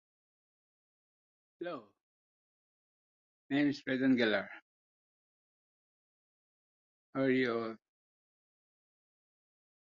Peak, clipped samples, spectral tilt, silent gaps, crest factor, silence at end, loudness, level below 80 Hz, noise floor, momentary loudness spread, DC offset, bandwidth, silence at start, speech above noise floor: -16 dBFS; under 0.1%; -4 dB/octave; 2.01-3.49 s, 4.62-7.13 s; 22 dB; 2.15 s; -34 LUFS; -82 dBFS; under -90 dBFS; 18 LU; under 0.1%; 7.2 kHz; 1.6 s; over 57 dB